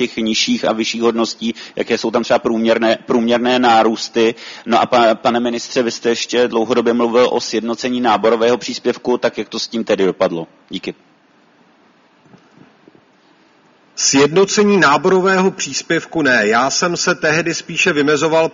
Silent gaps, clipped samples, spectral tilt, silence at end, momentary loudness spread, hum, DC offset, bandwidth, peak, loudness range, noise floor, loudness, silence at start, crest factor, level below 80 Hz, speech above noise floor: none; under 0.1%; -3.5 dB/octave; 0.05 s; 8 LU; none; under 0.1%; 7.6 kHz; 0 dBFS; 9 LU; -52 dBFS; -15 LUFS; 0 s; 16 dB; -58 dBFS; 37 dB